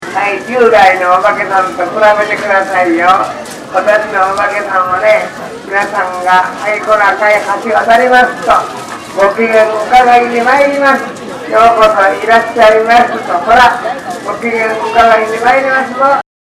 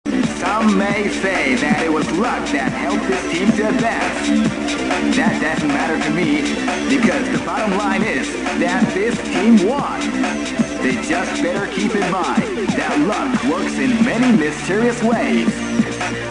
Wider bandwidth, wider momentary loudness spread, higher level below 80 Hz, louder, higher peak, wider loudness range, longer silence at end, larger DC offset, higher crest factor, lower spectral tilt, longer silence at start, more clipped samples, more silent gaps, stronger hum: first, 15 kHz vs 10.5 kHz; first, 9 LU vs 4 LU; about the same, -42 dBFS vs -44 dBFS; first, -9 LUFS vs -17 LUFS; about the same, 0 dBFS vs -2 dBFS; about the same, 3 LU vs 1 LU; first, 0.35 s vs 0 s; second, under 0.1% vs 0.2%; second, 10 dB vs 16 dB; second, -3.5 dB/octave vs -5 dB/octave; about the same, 0 s vs 0.05 s; first, 2% vs under 0.1%; neither; neither